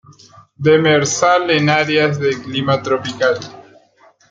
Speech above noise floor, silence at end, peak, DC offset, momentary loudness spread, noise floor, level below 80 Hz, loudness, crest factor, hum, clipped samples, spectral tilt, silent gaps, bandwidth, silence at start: 36 dB; 0.7 s; -2 dBFS; under 0.1%; 8 LU; -51 dBFS; -58 dBFS; -15 LUFS; 14 dB; none; under 0.1%; -4.5 dB/octave; none; 9.4 kHz; 0.6 s